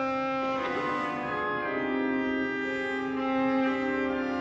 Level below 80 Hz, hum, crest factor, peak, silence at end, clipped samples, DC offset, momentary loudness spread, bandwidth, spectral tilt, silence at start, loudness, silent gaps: -60 dBFS; none; 12 dB; -16 dBFS; 0 s; under 0.1%; under 0.1%; 4 LU; 7.6 kHz; -6 dB/octave; 0 s; -29 LUFS; none